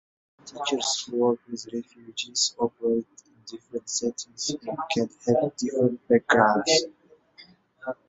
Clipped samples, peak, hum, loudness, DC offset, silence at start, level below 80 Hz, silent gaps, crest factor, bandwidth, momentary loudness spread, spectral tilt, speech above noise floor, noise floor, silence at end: under 0.1%; -4 dBFS; none; -25 LUFS; under 0.1%; 0.45 s; -68 dBFS; none; 22 dB; 8.4 kHz; 17 LU; -3 dB/octave; 29 dB; -54 dBFS; 0.15 s